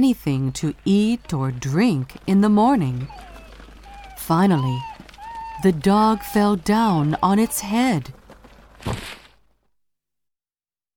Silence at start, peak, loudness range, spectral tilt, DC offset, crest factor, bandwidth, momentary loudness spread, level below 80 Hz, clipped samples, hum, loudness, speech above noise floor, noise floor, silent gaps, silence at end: 0 s; -6 dBFS; 5 LU; -6.5 dB/octave; under 0.1%; 16 dB; 19 kHz; 18 LU; -46 dBFS; under 0.1%; none; -20 LUFS; over 71 dB; under -90 dBFS; none; 1.8 s